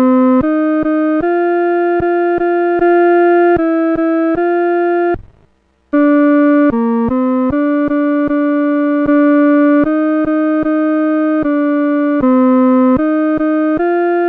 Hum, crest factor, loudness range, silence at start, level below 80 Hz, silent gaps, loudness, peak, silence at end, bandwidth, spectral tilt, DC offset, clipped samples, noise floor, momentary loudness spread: none; 8 dB; 1 LU; 0 s; -42 dBFS; none; -12 LUFS; -4 dBFS; 0 s; 4.3 kHz; -9.5 dB/octave; under 0.1%; under 0.1%; -54 dBFS; 4 LU